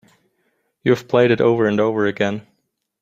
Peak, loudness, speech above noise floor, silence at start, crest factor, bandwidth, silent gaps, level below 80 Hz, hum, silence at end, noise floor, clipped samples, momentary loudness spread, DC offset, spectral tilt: -2 dBFS; -18 LUFS; 54 dB; 0.85 s; 18 dB; 15 kHz; none; -60 dBFS; none; 0.6 s; -71 dBFS; under 0.1%; 8 LU; under 0.1%; -7 dB/octave